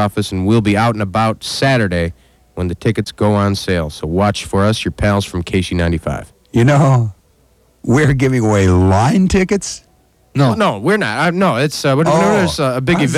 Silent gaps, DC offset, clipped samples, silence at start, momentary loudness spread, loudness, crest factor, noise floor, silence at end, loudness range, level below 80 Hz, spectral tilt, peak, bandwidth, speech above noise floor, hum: none; under 0.1%; under 0.1%; 0 s; 8 LU; -15 LUFS; 14 dB; -53 dBFS; 0 s; 3 LU; -34 dBFS; -6 dB/octave; -2 dBFS; 14 kHz; 39 dB; none